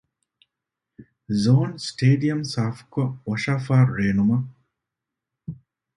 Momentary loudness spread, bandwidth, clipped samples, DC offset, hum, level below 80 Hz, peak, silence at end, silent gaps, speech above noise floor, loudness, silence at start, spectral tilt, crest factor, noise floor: 18 LU; 11 kHz; under 0.1%; under 0.1%; none; -54 dBFS; -6 dBFS; 0.45 s; none; 64 dB; -22 LUFS; 1 s; -7 dB/octave; 18 dB; -85 dBFS